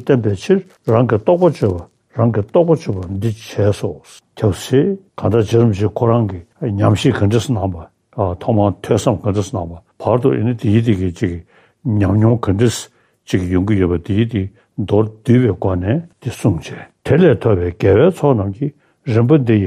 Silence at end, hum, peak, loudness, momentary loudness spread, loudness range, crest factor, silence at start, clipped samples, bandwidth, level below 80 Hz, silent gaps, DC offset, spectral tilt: 0 s; none; 0 dBFS; -16 LUFS; 12 LU; 2 LU; 14 dB; 0 s; under 0.1%; 14.5 kHz; -48 dBFS; none; under 0.1%; -7.5 dB/octave